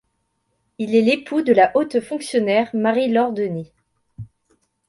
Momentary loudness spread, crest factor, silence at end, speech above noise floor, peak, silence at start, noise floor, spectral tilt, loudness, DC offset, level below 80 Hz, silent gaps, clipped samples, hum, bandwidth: 10 LU; 20 dB; 0.65 s; 53 dB; -2 dBFS; 0.8 s; -71 dBFS; -5.5 dB/octave; -19 LUFS; under 0.1%; -60 dBFS; none; under 0.1%; none; 11.5 kHz